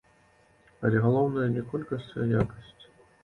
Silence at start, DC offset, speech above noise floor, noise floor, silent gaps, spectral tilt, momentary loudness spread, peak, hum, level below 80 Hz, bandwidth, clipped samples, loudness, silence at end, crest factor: 0.8 s; under 0.1%; 35 dB; -62 dBFS; none; -9.5 dB/octave; 10 LU; -10 dBFS; none; -54 dBFS; 4.3 kHz; under 0.1%; -28 LUFS; 0.4 s; 18 dB